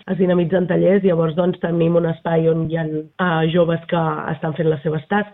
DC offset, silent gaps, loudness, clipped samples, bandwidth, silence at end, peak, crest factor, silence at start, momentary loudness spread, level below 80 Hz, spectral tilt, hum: under 0.1%; none; -19 LUFS; under 0.1%; 3.9 kHz; 0.05 s; -4 dBFS; 14 dB; 0.05 s; 6 LU; -52 dBFS; -11.5 dB/octave; none